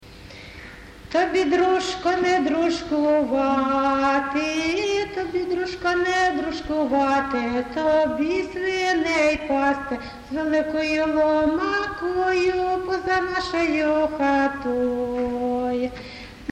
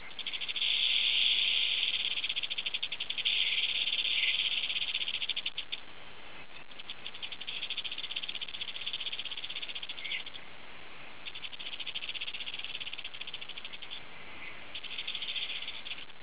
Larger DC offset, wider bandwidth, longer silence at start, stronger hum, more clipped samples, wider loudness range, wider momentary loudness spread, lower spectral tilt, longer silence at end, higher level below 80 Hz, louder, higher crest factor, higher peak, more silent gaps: second, under 0.1% vs 0.8%; first, 11 kHz vs 4 kHz; about the same, 0 s vs 0 s; neither; neither; second, 2 LU vs 11 LU; second, 7 LU vs 18 LU; first, -4.5 dB/octave vs 3 dB/octave; about the same, 0 s vs 0 s; first, -48 dBFS vs -70 dBFS; first, -22 LUFS vs -32 LUFS; second, 14 dB vs 22 dB; first, -8 dBFS vs -14 dBFS; neither